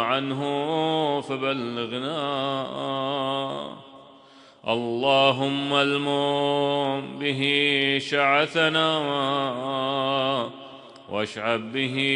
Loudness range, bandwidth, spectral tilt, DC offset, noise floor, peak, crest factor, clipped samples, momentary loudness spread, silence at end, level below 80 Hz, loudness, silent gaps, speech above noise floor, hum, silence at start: 6 LU; 10.5 kHz; -5 dB/octave; under 0.1%; -51 dBFS; -4 dBFS; 20 dB; under 0.1%; 9 LU; 0 s; -70 dBFS; -24 LUFS; none; 27 dB; none; 0 s